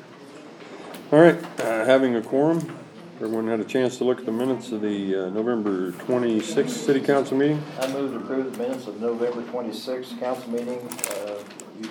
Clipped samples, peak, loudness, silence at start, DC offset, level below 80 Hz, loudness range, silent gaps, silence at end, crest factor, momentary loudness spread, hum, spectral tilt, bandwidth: under 0.1%; -2 dBFS; -24 LUFS; 0 s; under 0.1%; -80 dBFS; 7 LU; none; 0 s; 22 dB; 17 LU; none; -5.5 dB/octave; over 20 kHz